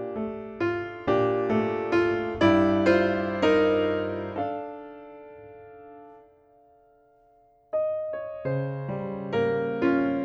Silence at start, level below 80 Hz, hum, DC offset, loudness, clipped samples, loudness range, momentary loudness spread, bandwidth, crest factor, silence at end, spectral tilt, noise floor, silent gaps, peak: 0 s; -56 dBFS; none; under 0.1%; -26 LUFS; under 0.1%; 15 LU; 23 LU; 7.6 kHz; 18 dB; 0 s; -7.5 dB/octave; -60 dBFS; none; -8 dBFS